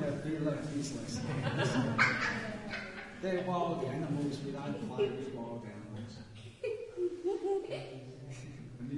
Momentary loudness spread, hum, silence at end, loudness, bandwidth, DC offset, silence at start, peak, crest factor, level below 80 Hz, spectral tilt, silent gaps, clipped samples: 15 LU; none; 0 s; -36 LUFS; 11.5 kHz; under 0.1%; 0 s; -14 dBFS; 22 dB; -64 dBFS; -5.5 dB/octave; none; under 0.1%